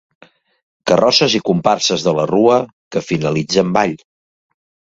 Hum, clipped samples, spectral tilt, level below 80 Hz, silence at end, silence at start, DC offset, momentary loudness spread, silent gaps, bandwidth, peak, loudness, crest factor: none; under 0.1%; -4.5 dB/octave; -54 dBFS; 0.95 s; 0.85 s; under 0.1%; 10 LU; 2.73-2.91 s; 7.8 kHz; 0 dBFS; -15 LUFS; 16 dB